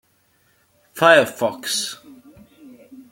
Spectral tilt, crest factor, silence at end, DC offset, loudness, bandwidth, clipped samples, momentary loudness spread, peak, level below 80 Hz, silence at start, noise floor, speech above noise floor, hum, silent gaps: -2.5 dB/octave; 22 dB; 0.15 s; under 0.1%; -18 LUFS; 17 kHz; under 0.1%; 23 LU; -2 dBFS; -68 dBFS; 0.95 s; -62 dBFS; 44 dB; none; none